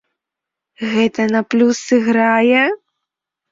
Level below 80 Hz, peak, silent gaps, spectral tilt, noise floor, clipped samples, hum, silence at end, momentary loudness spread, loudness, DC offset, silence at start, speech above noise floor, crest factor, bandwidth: -62 dBFS; -2 dBFS; none; -4.5 dB/octave; -83 dBFS; under 0.1%; none; 0.75 s; 8 LU; -15 LUFS; under 0.1%; 0.8 s; 69 dB; 14 dB; 7.8 kHz